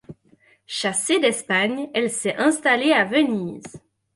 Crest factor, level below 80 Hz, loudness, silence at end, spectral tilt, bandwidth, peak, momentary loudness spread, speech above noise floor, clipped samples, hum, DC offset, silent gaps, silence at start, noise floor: 16 dB; -66 dBFS; -20 LUFS; 0.4 s; -3 dB/octave; 11.5 kHz; -6 dBFS; 10 LU; 37 dB; under 0.1%; none; under 0.1%; none; 0.1 s; -58 dBFS